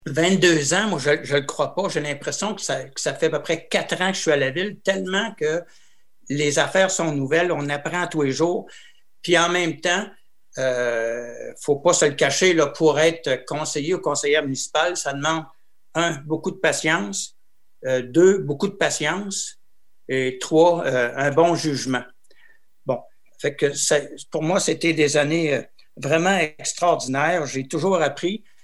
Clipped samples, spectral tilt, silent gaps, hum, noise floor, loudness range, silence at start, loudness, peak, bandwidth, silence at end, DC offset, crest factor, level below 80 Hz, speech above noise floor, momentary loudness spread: under 0.1%; -3.5 dB/octave; none; none; -61 dBFS; 3 LU; 0.05 s; -21 LUFS; -2 dBFS; 12.5 kHz; 0.25 s; 0.5%; 20 dB; -68 dBFS; 40 dB; 10 LU